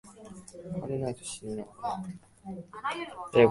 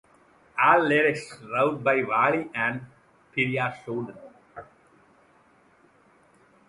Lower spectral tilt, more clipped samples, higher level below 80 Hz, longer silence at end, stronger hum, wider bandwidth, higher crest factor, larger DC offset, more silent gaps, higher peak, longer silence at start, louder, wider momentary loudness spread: about the same, -5.5 dB/octave vs -6 dB/octave; neither; first, -62 dBFS vs -68 dBFS; second, 0 s vs 2.05 s; neither; about the same, 11.5 kHz vs 11.5 kHz; about the same, 24 dB vs 24 dB; neither; neither; about the same, -6 dBFS vs -4 dBFS; second, 0.05 s vs 0.55 s; second, -34 LUFS vs -24 LUFS; second, 15 LU vs 20 LU